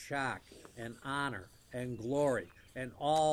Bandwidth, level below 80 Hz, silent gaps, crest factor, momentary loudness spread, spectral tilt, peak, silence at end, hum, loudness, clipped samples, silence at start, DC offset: 16 kHz; -66 dBFS; none; 16 dB; 15 LU; -5 dB/octave; -20 dBFS; 0 s; none; -37 LUFS; under 0.1%; 0 s; under 0.1%